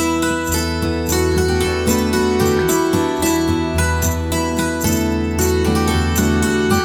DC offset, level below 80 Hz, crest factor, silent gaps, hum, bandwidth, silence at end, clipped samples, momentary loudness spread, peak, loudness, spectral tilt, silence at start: under 0.1%; -28 dBFS; 12 dB; none; none; 19.5 kHz; 0 s; under 0.1%; 3 LU; -4 dBFS; -17 LUFS; -5 dB/octave; 0 s